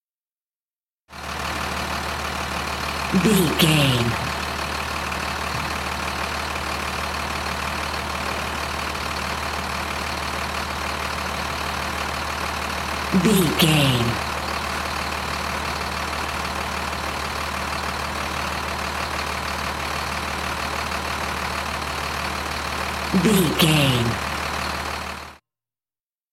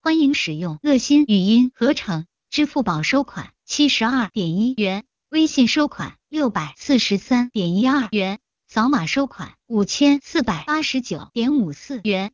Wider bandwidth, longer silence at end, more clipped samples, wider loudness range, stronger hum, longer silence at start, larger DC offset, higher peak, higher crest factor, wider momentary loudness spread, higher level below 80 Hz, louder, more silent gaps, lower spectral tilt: first, 16.5 kHz vs 7.6 kHz; first, 0.95 s vs 0.05 s; neither; first, 5 LU vs 2 LU; neither; first, 1.1 s vs 0.05 s; first, 0.1% vs under 0.1%; first, -2 dBFS vs -6 dBFS; first, 22 dB vs 14 dB; second, 8 LU vs 11 LU; first, -40 dBFS vs -54 dBFS; second, -23 LUFS vs -20 LUFS; neither; about the same, -4 dB/octave vs -4.5 dB/octave